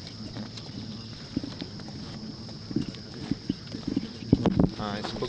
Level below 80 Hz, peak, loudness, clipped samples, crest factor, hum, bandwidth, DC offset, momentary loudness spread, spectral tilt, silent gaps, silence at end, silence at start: -46 dBFS; -4 dBFS; -32 LUFS; under 0.1%; 28 dB; none; 9.2 kHz; under 0.1%; 14 LU; -7 dB/octave; none; 0 s; 0 s